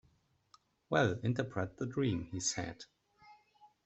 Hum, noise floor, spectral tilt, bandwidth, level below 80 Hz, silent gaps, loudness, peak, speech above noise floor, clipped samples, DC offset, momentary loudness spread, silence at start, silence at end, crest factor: none; -73 dBFS; -4.5 dB/octave; 8.2 kHz; -66 dBFS; none; -36 LUFS; -16 dBFS; 37 dB; under 0.1%; under 0.1%; 12 LU; 0.9 s; 0.2 s; 22 dB